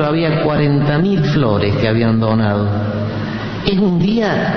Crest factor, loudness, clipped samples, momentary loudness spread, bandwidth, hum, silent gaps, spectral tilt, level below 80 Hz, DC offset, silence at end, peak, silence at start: 14 dB; -15 LUFS; under 0.1%; 6 LU; 6.4 kHz; none; none; -8.5 dB/octave; -38 dBFS; under 0.1%; 0 s; -2 dBFS; 0 s